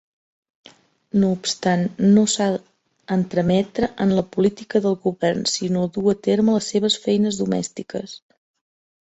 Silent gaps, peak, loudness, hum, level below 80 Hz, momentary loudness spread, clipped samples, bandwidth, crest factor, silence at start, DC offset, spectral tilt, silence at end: none; -4 dBFS; -20 LUFS; none; -56 dBFS; 8 LU; under 0.1%; 8.2 kHz; 16 dB; 1.15 s; under 0.1%; -5.5 dB/octave; 0.85 s